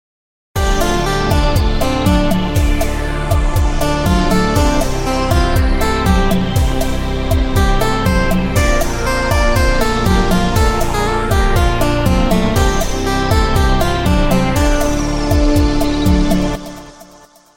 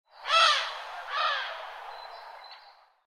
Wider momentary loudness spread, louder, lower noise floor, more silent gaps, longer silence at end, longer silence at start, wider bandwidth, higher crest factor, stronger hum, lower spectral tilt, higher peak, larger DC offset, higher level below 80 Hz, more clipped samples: second, 4 LU vs 24 LU; first, -15 LUFS vs -26 LUFS; second, -43 dBFS vs -56 dBFS; neither; first, 0.55 s vs 0.35 s; first, 0.55 s vs 0.15 s; first, 17 kHz vs 13.5 kHz; second, 12 dB vs 20 dB; neither; first, -5.5 dB/octave vs 4.5 dB/octave; first, 0 dBFS vs -10 dBFS; neither; first, -18 dBFS vs -74 dBFS; neither